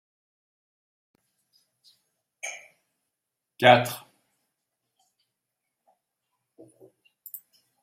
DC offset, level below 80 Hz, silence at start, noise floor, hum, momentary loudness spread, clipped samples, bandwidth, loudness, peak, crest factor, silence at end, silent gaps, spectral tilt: under 0.1%; -76 dBFS; 2.45 s; -85 dBFS; none; 25 LU; under 0.1%; 16 kHz; -22 LUFS; -2 dBFS; 30 dB; 3.85 s; none; -4 dB/octave